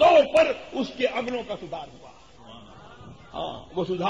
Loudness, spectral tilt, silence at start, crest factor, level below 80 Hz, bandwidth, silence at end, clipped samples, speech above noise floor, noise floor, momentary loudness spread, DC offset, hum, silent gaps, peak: -25 LUFS; -5 dB/octave; 0 s; 18 dB; -56 dBFS; 11 kHz; 0 s; under 0.1%; 18 dB; -47 dBFS; 27 LU; 0.2%; none; none; -6 dBFS